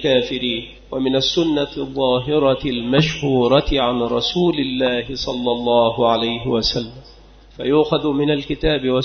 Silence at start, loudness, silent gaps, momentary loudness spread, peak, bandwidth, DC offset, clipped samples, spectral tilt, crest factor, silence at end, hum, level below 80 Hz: 0 s; -18 LUFS; none; 7 LU; 0 dBFS; 6.6 kHz; under 0.1%; under 0.1%; -6 dB/octave; 18 dB; 0 s; none; -38 dBFS